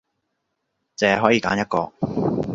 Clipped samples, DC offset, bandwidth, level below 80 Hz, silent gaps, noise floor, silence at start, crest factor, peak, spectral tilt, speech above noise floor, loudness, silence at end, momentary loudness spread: under 0.1%; under 0.1%; 7.6 kHz; -52 dBFS; none; -76 dBFS; 1 s; 22 dB; 0 dBFS; -5.5 dB/octave; 56 dB; -21 LUFS; 0 s; 8 LU